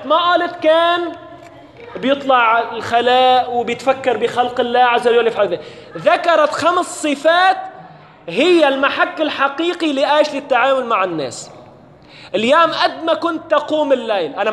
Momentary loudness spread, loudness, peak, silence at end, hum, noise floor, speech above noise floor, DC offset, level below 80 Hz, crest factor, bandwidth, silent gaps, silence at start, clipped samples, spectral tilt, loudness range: 11 LU; -15 LUFS; 0 dBFS; 0 s; none; -42 dBFS; 27 dB; under 0.1%; -62 dBFS; 16 dB; 12 kHz; none; 0 s; under 0.1%; -3.5 dB/octave; 3 LU